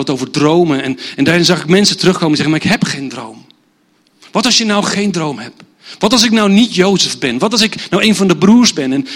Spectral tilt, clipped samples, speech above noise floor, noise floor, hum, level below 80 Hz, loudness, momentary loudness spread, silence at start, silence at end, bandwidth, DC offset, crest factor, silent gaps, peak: -4 dB/octave; 0.1%; 43 dB; -55 dBFS; none; -50 dBFS; -11 LUFS; 11 LU; 0 s; 0 s; 16.5 kHz; under 0.1%; 12 dB; none; 0 dBFS